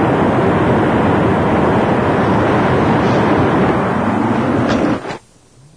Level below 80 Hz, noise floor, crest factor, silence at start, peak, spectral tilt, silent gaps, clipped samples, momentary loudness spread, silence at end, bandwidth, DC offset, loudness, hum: -36 dBFS; -46 dBFS; 12 dB; 0 s; -2 dBFS; -7.5 dB/octave; none; under 0.1%; 3 LU; 0.6 s; 10.5 kHz; under 0.1%; -14 LUFS; none